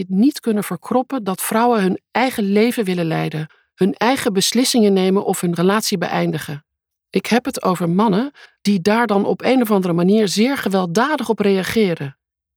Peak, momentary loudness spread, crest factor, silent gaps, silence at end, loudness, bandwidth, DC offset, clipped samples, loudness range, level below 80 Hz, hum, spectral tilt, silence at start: -2 dBFS; 8 LU; 14 dB; none; 0.45 s; -18 LUFS; 19 kHz; under 0.1%; under 0.1%; 2 LU; -60 dBFS; none; -5 dB/octave; 0 s